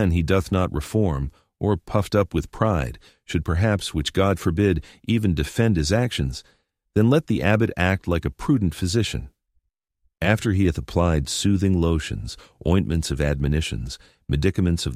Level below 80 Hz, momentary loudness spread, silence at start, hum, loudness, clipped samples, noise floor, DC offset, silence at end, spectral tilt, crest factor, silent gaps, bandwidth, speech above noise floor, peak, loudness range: -34 dBFS; 9 LU; 0 s; none; -23 LUFS; under 0.1%; -70 dBFS; under 0.1%; 0 s; -6 dB/octave; 20 dB; none; 15.5 kHz; 49 dB; -2 dBFS; 2 LU